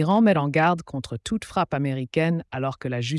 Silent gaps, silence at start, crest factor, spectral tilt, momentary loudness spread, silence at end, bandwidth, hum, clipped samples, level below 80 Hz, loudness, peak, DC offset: none; 0 s; 14 dB; -6.5 dB/octave; 10 LU; 0 s; 12 kHz; none; under 0.1%; -54 dBFS; -24 LUFS; -10 dBFS; under 0.1%